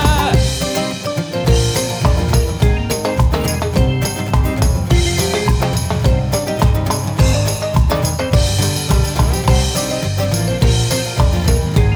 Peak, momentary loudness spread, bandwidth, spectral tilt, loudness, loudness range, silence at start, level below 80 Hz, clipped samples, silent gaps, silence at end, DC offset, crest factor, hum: -2 dBFS; 4 LU; over 20 kHz; -5 dB/octave; -16 LUFS; 1 LU; 0 s; -20 dBFS; under 0.1%; none; 0 s; under 0.1%; 14 dB; none